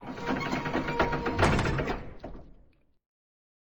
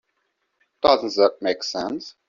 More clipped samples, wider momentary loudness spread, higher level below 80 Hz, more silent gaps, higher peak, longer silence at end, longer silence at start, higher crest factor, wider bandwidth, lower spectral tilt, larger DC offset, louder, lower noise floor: neither; first, 18 LU vs 9 LU; first, -42 dBFS vs -60 dBFS; neither; second, -10 dBFS vs -2 dBFS; first, 1.25 s vs 0.2 s; second, 0 s vs 0.85 s; about the same, 22 dB vs 20 dB; first, over 20 kHz vs 7.4 kHz; first, -6 dB/octave vs -3.5 dB/octave; neither; second, -29 LUFS vs -21 LUFS; second, -60 dBFS vs -73 dBFS